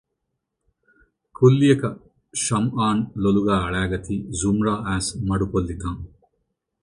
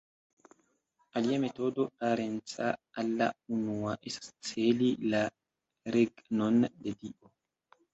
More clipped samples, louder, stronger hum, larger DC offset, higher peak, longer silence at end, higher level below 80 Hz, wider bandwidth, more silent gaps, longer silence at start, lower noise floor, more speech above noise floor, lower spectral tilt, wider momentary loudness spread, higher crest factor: neither; first, -22 LUFS vs -32 LUFS; neither; neither; first, -2 dBFS vs -14 dBFS; about the same, 0.75 s vs 0.8 s; first, -40 dBFS vs -70 dBFS; first, 11.5 kHz vs 8.2 kHz; neither; first, 1.4 s vs 1.15 s; first, -79 dBFS vs -75 dBFS; first, 58 dB vs 43 dB; about the same, -6 dB/octave vs -5.5 dB/octave; about the same, 13 LU vs 11 LU; about the same, 20 dB vs 18 dB